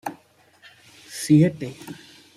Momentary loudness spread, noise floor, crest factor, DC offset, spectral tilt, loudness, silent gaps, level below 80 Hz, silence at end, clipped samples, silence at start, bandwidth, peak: 23 LU; -56 dBFS; 20 dB; under 0.1%; -6.5 dB/octave; -20 LUFS; none; -64 dBFS; 0.4 s; under 0.1%; 0.05 s; 14.5 kHz; -6 dBFS